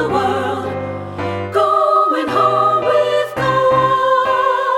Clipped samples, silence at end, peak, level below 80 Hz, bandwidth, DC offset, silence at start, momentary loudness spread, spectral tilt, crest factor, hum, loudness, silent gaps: under 0.1%; 0 s; -2 dBFS; -50 dBFS; 16 kHz; under 0.1%; 0 s; 10 LU; -5.5 dB/octave; 12 dB; none; -15 LUFS; none